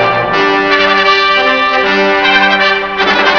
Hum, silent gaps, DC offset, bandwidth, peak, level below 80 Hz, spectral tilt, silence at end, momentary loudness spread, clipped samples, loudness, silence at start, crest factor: none; none; 0.5%; 5.4 kHz; 0 dBFS; -42 dBFS; -4 dB/octave; 0 s; 3 LU; 0.3%; -9 LUFS; 0 s; 10 dB